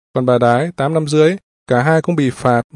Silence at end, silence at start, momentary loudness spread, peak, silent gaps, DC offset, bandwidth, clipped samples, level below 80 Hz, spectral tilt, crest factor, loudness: 0.15 s; 0.15 s; 5 LU; 0 dBFS; 1.43-1.66 s; under 0.1%; 11.5 kHz; under 0.1%; -54 dBFS; -7 dB/octave; 14 dB; -15 LUFS